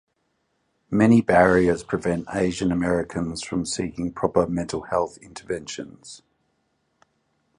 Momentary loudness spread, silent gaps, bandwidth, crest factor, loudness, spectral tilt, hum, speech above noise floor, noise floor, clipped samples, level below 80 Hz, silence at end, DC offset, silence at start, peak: 17 LU; none; 11 kHz; 22 dB; -23 LUFS; -6 dB/octave; none; 50 dB; -72 dBFS; under 0.1%; -48 dBFS; 1.4 s; under 0.1%; 0.9 s; -2 dBFS